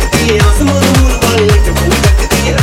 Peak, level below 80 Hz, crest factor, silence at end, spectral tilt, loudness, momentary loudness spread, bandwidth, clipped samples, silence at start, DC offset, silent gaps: 0 dBFS; -14 dBFS; 8 dB; 0 s; -5 dB/octave; -9 LUFS; 2 LU; 17 kHz; 0.1%; 0 s; under 0.1%; none